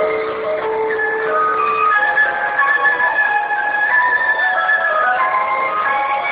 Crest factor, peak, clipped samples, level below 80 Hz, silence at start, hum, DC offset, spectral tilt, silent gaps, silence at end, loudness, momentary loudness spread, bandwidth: 12 dB; -4 dBFS; under 0.1%; -58 dBFS; 0 s; none; under 0.1%; -6 dB/octave; none; 0 s; -15 LUFS; 6 LU; 4.9 kHz